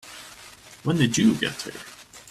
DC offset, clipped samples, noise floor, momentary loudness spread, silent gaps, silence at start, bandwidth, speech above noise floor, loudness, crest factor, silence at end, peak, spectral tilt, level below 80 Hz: under 0.1%; under 0.1%; -47 dBFS; 24 LU; none; 0.05 s; 14.5 kHz; 24 dB; -23 LUFS; 20 dB; 0.1 s; -6 dBFS; -4.5 dB/octave; -58 dBFS